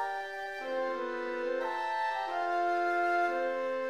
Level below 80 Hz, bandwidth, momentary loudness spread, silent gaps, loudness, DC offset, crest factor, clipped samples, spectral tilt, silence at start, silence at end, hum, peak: -76 dBFS; 13 kHz; 7 LU; none; -32 LUFS; 0.1%; 12 dB; under 0.1%; -3 dB/octave; 0 s; 0 s; none; -20 dBFS